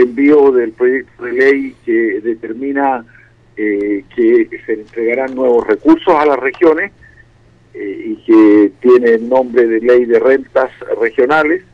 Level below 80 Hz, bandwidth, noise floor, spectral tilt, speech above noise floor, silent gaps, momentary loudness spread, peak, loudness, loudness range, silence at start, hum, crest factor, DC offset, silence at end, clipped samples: -50 dBFS; 6.2 kHz; -47 dBFS; -7 dB/octave; 35 dB; none; 12 LU; -2 dBFS; -12 LUFS; 5 LU; 0 s; none; 12 dB; under 0.1%; 0.15 s; under 0.1%